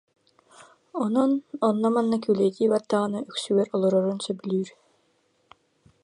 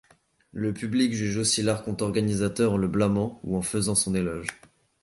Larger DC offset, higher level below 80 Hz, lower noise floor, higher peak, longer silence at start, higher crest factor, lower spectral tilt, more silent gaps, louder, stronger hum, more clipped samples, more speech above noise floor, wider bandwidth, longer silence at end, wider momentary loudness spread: neither; second, -74 dBFS vs -50 dBFS; first, -68 dBFS vs -59 dBFS; about the same, -8 dBFS vs -10 dBFS; about the same, 0.6 s vs 0.55 s; about the same, 18 dB vs 18 dB; first, -6.5 dB/octave vs -4.5 dB/octave; neither; about the same, -25 LUFS vs -26 LUFS; neither; neither; first, 44 dB vs 34 dB; about the same, 11 kHz vs 12 kHz; first, 1.35 s vs 0.5 s; about the same, 8 LU vs 7 LU